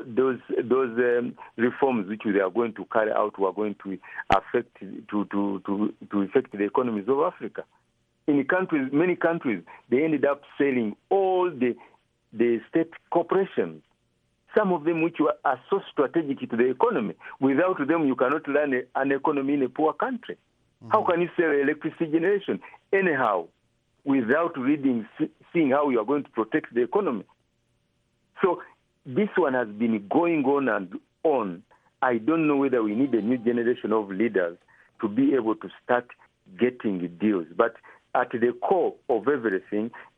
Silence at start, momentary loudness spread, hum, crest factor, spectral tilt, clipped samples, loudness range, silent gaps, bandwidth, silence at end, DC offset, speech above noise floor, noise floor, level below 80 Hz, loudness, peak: 0 s; 8 LU; none; 18 dB; -8.5 dB/octave; under 0.1%; 3 LU; none; 6.4 kHz; 0.15 s; under 0.1%; 46 dB; -71 dBFS; -64 dBFS; -25 LUFS; -6 dBFS